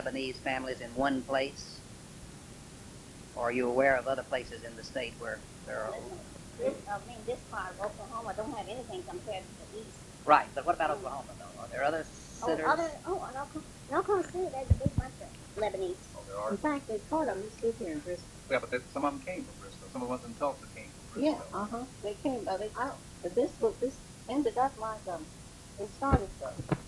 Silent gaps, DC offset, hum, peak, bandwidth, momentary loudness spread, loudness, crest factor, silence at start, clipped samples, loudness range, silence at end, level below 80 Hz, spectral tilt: none; under 0.1%; none; -8 dBFS; 12 kHz; 16 LU; -34 LUFS; 26 dB; 0 s; under 0.1%; 6 LU; 0 s; -50 dBFS; -5.5 dB/octave